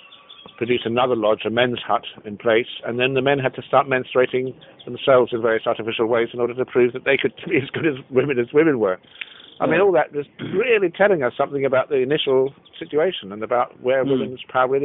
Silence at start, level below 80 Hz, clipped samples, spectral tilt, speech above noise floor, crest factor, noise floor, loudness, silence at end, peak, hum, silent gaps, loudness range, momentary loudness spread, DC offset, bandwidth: 0.1 s; -62 dBFS; under 0.1%; -9.5 dB/octave; 24 dB; 18 dB; -44 dBFS; -20 LUFS; 0 s; -2 dBFS; none; none; 1 LU; 9 LU; under 0.1%; 4 kHz